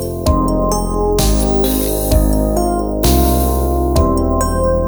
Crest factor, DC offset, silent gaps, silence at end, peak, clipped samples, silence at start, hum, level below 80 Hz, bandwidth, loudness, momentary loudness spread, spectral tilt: 14 dB; under 0.1%; none; 0 s; 0 dBFS; under 0.1%; 0 s; none; -18 dBFS; over 20 kHz; -15 LUFS; 3 LU; -6 dB/octave